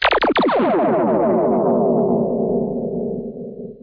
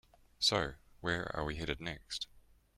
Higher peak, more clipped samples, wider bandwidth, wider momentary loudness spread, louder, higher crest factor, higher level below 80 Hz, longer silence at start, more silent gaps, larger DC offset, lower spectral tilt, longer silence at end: first, -6 dBFS vs -16 dBFS; neither; second, 5.2 kHz vs 16 kHz; about the same, 11 LU vs 11 LU; first, -18 LUFS vs -37 LUFS; second, 12 dB vs 22 dB; first, -48 dBFS vs -54 dBFS; second, 0 s vs 0.4 s; neither; neither; first, -8.5 dB/octave vs -3.5 dB/octave; second, 0.05 s vs 0.4 s